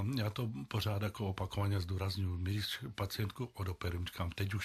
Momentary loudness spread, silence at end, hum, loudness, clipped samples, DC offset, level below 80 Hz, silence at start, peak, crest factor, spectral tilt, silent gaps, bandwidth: 4 LU; 0 s; none; -38 LUFS; under 0.1%; under 0.1%; -60 dBFS; 0 s; -24 dBFS; 14 dB; -6 dB/octave; none; 14.5 kHz